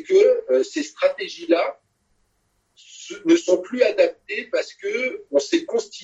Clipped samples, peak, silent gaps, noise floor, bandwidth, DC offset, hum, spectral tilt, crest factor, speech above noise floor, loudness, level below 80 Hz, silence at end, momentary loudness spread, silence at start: under 0.1%; -4 dBFS; none; -68 dBFS; 8.2 kHz; under 0.1%; none; -3 dB/octave; 18 dB; 48 dB; -21 LUFS; -70 dBFS; 0 s; 11 LU; 0 s